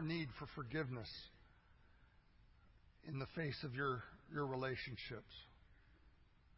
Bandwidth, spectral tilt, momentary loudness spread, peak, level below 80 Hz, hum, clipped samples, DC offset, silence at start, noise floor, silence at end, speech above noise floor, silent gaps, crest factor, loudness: 5.6 kHz; -4.5 dB/octave; 17 LU; -30 dBFS; -68 dBFS; none; under 0.1%; under 0.1%; 0 s; -69 dBFS; 0.35 s; 23 dB; none; 18 dB; -46 LUFS